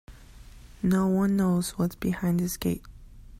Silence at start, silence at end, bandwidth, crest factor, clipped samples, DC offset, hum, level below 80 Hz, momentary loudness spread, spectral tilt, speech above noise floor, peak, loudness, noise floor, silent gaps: 0.1 s; 0 s; 16 kHz; 14 dB; under 0.1%; under 0.1%; none; -48 dBFS; 7 LU; -6.5 dB/octave; 22 dB; -14 dBFS; -27 LUFS; -48 dBFS; none